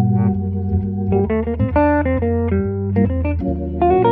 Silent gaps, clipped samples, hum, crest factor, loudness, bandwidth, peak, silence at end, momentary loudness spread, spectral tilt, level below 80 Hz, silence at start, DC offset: none; under 0.1%; none; 14 dB; -18 LUFS; 3.8 kHz; -4 dBFS; 0 s; 5 LU; -12.5 dB/octave; -30 dBFS; 0 s; under 0.1%